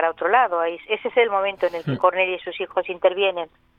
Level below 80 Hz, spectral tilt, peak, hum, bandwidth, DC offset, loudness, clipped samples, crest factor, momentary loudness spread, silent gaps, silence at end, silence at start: -64 dBFS; -7 dB/octave; -4 dBFS; none; 5.4 kHz; under 0.1%; -21 LUFS; under 0.1%; 18 dB; 7 LU; none; 0.35 s; 0 s